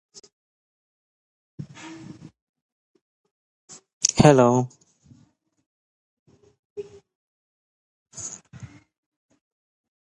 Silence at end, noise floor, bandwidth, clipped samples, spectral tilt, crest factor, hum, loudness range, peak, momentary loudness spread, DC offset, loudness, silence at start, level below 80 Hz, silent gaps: 1.45 s; -62 dBFS; 11 kHz; under 0.1%; -5 dB/octave; 28 dB; none; 21 LU; 0 dBFS; 28 LU; under 0.1%; -19 LUFS; 1.6 s; -54 dBFS; 2.42-2.54 s, 2.62-2.95 s, 3.01-3.24 s, 3.31-3.68 s, 3.93-4.01 s, 5.66-6.26 s, 6.59-6.76 s, 7.15-8.06 s